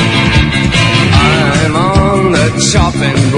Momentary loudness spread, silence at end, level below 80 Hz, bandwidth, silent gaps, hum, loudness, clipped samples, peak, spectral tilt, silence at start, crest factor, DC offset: 3 LU; 0 s; -22 dBFS; 11 kHz; none; none; -9 LUFS; 0.4%; 0 dBFS; -5 dB/octave; 0 s; 10 dB; under 0.1%